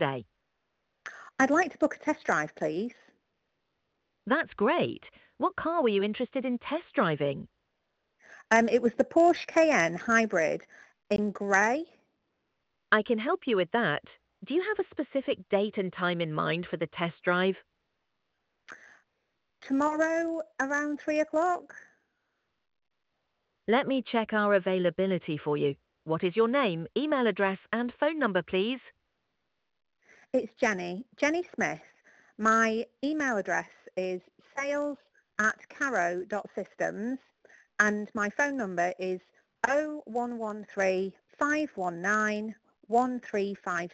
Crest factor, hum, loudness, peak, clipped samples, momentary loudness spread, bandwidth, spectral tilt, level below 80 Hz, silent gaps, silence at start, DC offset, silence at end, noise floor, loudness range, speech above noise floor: 22 dB; none; -29 LUFS; -8 dBFS; under 0.1%; 11 LU; 8.6 kHz; -5 dB/octave; -70 dBFS; none; 0 s; under 0.1%; 0.05 s; -81 dBFS; 6 LU; 52 dB